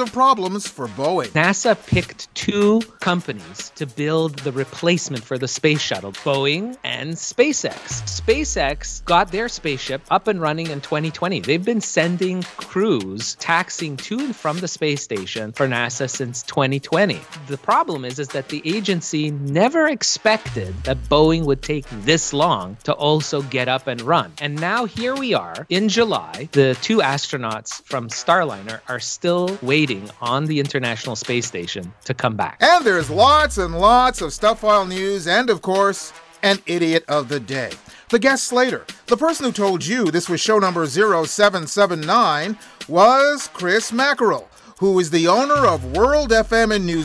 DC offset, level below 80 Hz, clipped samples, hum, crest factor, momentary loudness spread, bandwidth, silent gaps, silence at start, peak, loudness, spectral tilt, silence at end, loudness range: under 0.1%; -42 dBFS; under 0.1%; none; 20 dB; 10 LU; 11 kHz; none; 0 s; 0 dBFS; -19 LUFS; -4 dB/octave; 0 s; 5 LU